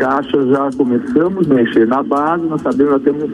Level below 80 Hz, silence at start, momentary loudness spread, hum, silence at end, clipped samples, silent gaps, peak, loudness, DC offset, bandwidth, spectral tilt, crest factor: -52 dBFS; 0 s; 4 LU; none; 0 s; under 0.1%; none; 0 dBFS; -14 LUFS; under 0.1%; 10.5 kHz; -8 dB/octave; 14 dB